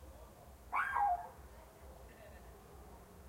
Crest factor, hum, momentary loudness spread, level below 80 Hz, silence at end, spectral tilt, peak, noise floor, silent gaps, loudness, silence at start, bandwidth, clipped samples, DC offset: 20 dB; none; 22 LU; -60 dBFS; 0 s; -4.5 dB/octave; -24 dBFS; -57 dBFS; none; -37 LUFS; 0 s; 16 kHz; under 0.1%; under 0.1%